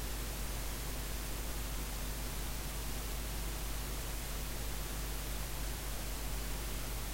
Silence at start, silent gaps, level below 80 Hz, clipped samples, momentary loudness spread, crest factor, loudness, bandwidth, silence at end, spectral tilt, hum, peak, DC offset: 0 s; none; -42 dBFS; under 0.1%; 0 LU; 12 dB; -41 LUFS; 16 kHz; 0 s; -3.5 dB/octave; none; -26 dBFS; under 0.1%